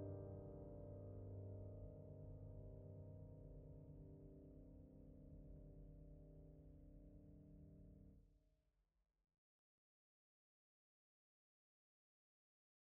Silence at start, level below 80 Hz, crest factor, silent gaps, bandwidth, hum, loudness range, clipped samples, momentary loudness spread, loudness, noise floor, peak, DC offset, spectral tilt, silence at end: 0 s; -68 dBFS; 16 dB; none; 2 kHz; none; 10 LU; under 0.1%; 10 LU; -60 LUFS; -86 dBFS; -44 dBFS; under 0.1%; -12 dB/octave; 4 s